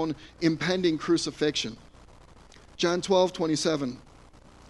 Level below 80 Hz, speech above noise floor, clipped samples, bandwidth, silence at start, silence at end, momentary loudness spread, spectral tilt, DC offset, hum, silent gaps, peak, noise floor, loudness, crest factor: -56 dBFS; 26 dB; under 0.1%; 11.5 kHz; 0 s; 0.7 s; 9 LU; -4.5 dB/octave; under 0.1%; none; none; -10 dBFS; -52 dBFS; -27 LUFS; 18 dB